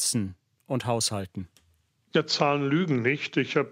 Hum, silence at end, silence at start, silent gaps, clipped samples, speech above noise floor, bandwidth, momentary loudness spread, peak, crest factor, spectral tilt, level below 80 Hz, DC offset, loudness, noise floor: none; 0 s; 0 s; none; under 0.1%; 41 dB; 16 kHz; 14 LU; -6 dBFS; 20 dB; -4 dB/octave; -66 dBFS; under 0.1%; -26 LUFS; -68 dBFS